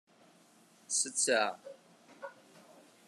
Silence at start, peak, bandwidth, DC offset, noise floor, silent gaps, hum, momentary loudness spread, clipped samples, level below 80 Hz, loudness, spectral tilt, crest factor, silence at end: 0.9 s; -14 dBFS; 13.5 kHz; under 0.1%; -64 dBFS; none; none; 21 LU; under 0.1%; under -90 dBFS; -31 LUFS; 0 dB/octave; 24 dB; 0.75 s